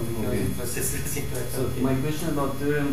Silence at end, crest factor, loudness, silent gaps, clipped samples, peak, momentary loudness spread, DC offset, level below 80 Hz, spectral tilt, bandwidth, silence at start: 0 s; 14 dB; -27 LUFS; none; under 0.1%; -12 dBFS; 4 LU; 3%; -40 dBFS; -5 dB/octave; 15.5 kHz; 0 s